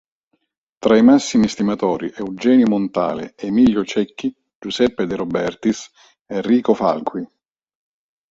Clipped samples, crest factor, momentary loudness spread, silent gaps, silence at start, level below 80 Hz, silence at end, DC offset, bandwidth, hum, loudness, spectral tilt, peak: under 0.1%; 16 dB; 14 LU; 4.55-4.62 s, 6.21-6.26 s; 0.8 s; -54 dBFS; 1.05 s; under 0.1%; 8 kHz; none; -18 LUFS; -5.5 dB/octave; -2 dBFS